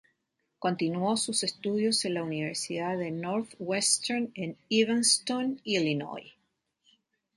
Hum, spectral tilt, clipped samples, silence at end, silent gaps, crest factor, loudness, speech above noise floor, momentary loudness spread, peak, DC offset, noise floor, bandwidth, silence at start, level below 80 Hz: none; -3 dB/octave; under 0.1%; 1.05 s; none; 22 dB; -29 LUFS; 50 dB; 9 LU; -10 dBFS; under 0.1%; -80 dBFS; 11.5 kHz; 0.6 s; -76 dBFS